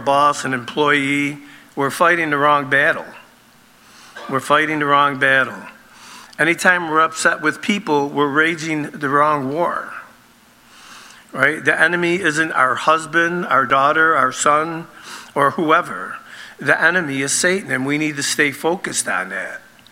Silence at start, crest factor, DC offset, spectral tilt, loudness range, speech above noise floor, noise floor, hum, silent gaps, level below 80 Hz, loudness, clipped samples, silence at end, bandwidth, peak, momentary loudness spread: 0 s; 18 dB; under 0.1%; -3.5 dB/octave; 3 LU; 33 dB; -50 dBFS; none; none; -66 dBFS; -17 LUFS; under 0.1%; 0.3 s; 16.5 kHz; 0 dBFS; 14 LU